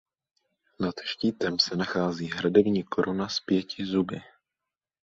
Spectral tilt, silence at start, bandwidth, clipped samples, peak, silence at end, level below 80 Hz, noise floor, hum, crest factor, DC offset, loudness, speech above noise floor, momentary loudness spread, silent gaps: -5.5 dB/octave; 0.8 s; 7.8 kHz; under 0.1%; -6 dBFS; 0.8 s; -62 dBFS; -89 dBFS; none; 22 dB; under 0.1%; -27 LUFS; 62 dB; 9 LU; none